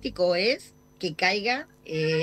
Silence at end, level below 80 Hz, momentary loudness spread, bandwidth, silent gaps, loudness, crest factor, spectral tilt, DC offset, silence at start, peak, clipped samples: 0 s; -58 dBFS; 11 LU; 13.5 kHz; none; -26 LUFS; 20 dB; -4.5 dB/octave; under 0.1%; 0 s; -8 dBFS; under 0.1%